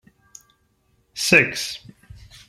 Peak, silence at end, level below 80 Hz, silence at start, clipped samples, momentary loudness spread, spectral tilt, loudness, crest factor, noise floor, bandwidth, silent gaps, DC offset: -2 dBFS; 0.7 s; -56 dBFS; 1.15 s; under 0.1%; 22 LU; -3 dB/octave; -18 LUFS; 24 dB; -65 dBFS; 16 kHz; none; under 0.1%